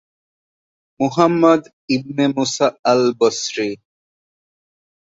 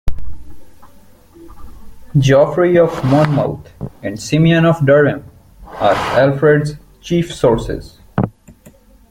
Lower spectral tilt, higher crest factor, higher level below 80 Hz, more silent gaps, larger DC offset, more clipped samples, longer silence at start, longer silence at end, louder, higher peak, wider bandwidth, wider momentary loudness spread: second, -4.5 dB/octave vs -7 dB/octave; about the same, 18 dB vs 14 dB; second, -62 dBFS vs -34 dBFS; first, 1.73-1.88 s, 2.79-2.83 s vs none; neither; neither; first, 1 s vs 0.05 s; first, 1.4 s vs 0.8 s; second, -17 LUFS vs -14 LUFS; about the same, -2 dBFS vs 0 dBFS; second, 8 kHz vs 15.5 kHz; second, 9 LU vs 17 LU